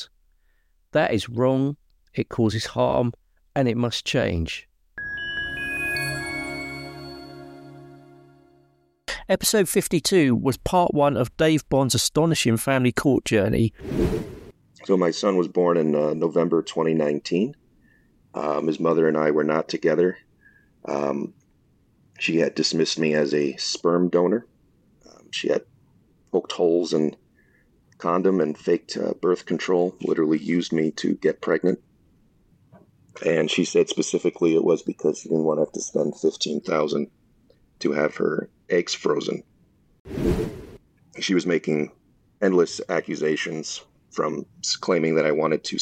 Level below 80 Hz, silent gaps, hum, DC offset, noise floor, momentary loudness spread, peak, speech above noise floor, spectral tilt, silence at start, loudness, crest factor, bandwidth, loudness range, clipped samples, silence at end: -48 dBFS; 40.00-40.05 s; none; under 0.1%; -64 dBFS; 11 LU; -8 dBFS; 42 dB; -5 dB/octave; 0 s; -23 LUFS; 16 dB; 15.5 kHz; 6 LU; under 0.1%; 0 s